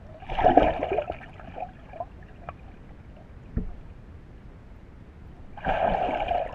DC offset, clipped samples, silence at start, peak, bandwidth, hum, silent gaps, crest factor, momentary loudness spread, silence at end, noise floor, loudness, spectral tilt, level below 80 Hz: under 0.1%; under 0.1%; 0 s; 0 dBFS; 7 kHz; none; none; 28 dB; 26 LU; 0 s; -46 dBFS; -27 LUFS; -8 dB/octave; -40 dBFS